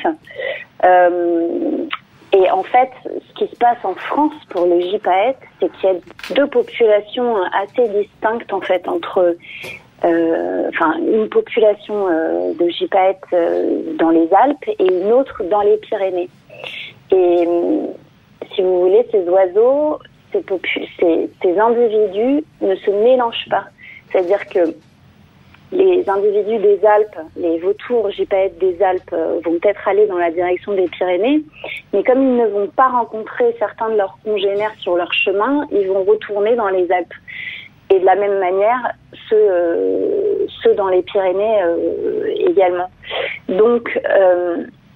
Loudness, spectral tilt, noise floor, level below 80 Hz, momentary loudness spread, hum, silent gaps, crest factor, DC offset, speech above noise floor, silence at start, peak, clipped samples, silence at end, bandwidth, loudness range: -16 LUFS; -6.5 dB/octave; -47 dBFS; -58 dBFS; 10 LU; none; none; 14 dB; under 0.1%; 32 dB; 0 s; -2 dBFS; under 0.1%; 0.25 s; 5.6 kHz; 2 LU